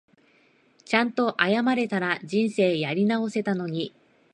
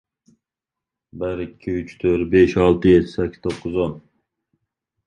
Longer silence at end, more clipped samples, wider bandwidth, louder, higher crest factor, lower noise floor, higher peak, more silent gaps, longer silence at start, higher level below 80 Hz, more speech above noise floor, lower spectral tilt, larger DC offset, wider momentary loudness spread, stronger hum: second, 0.45 s vs 1.05 s; neither; first, 10 kHz vs 9 kHz; second, -25 LUFS vs -19 LUFS; about the same, 22 dB vs 18 dB; second, -61 dBFS vs -87 dBFS; about the same, -2 dBFS vs -2 dBFS; neither; second, 0.9 s vs 1.15 s; second, -74 dBFS vs -42 dBFS; second, 37 dB vs 68 dB; second, -6 dB/octave vs -8 dB/octave; neither; second, 6 LU vs 13 LU; neither